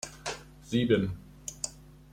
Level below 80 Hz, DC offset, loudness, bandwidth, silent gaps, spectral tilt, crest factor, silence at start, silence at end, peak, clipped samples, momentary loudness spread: -54 dBFS; under 0.1%; -32 LUFS; 16 kHz; none; -5 dB/octave; 20 dB; 0.05 s; 0.3 s; -12 dBFS; under 0.1%; 15 LU